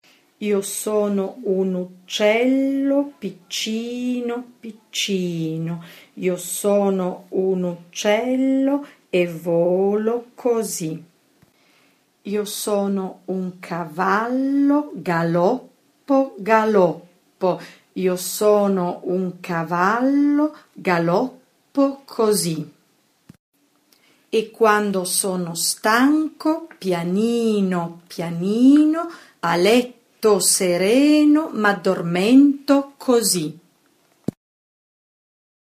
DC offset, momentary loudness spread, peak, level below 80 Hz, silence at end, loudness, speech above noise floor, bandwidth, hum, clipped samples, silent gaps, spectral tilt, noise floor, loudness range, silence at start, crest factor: under 0.1%; 12 LU; 0 dBFS; -68 dBFS; 2.2 s; -20 LUFS; 42 dB; 15.5 kHz; none; under 0.1%; 23.39-23.52 s; -4.5 dB/octave; -62 dBFS; 7 LU; 0.4 s; 20 dB